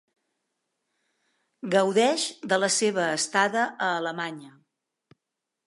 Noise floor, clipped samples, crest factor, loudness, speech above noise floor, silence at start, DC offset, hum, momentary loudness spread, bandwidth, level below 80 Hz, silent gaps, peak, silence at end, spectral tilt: -85 dBFS; under 0.1%; 20 dB; -25 LUFS; 60 dB; 1.65 s; under 0.1%; none; 11 LU; 11.5 kHz; -84 dBFS; none; -8 dBFS; 1.15 s; -2.5 dB/octave